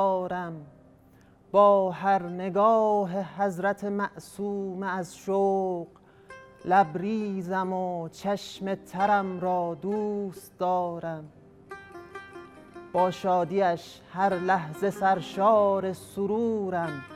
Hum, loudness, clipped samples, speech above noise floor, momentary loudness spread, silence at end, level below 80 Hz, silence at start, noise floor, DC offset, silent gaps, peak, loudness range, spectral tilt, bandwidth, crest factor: none; -27 LUFS; under 0.1%; 30 dB; 17 LU; 0 s; -66 dBFS; 0 s; -57 dBFS; under 0.1%; none; -8 dBFS; 6 LU; -6.5 dB/octave; 14.5 kHz; 18 dB